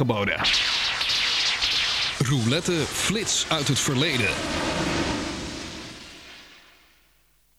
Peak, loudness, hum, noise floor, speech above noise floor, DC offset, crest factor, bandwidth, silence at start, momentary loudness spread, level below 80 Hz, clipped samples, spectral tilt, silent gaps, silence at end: -8 dBFS; -23 LUFS; none; -63 dBFS; 39 dB; under 0.1%; 16 dB; 16.5 kHz; 0 s; 15 LU; -46 dBFS; under 0.1%; -3 dB/octave; none; 1 s